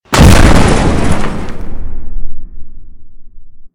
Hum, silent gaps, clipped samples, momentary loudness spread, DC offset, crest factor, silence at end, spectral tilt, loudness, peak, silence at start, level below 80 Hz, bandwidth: none; none; 3%; 23 LU; under 0.1%; 8 dB; 0.1 s; -5.5 dB/octave; -9 LUFS; 0 dBFS; 0.1 s; -14 dBFS; 16 kHz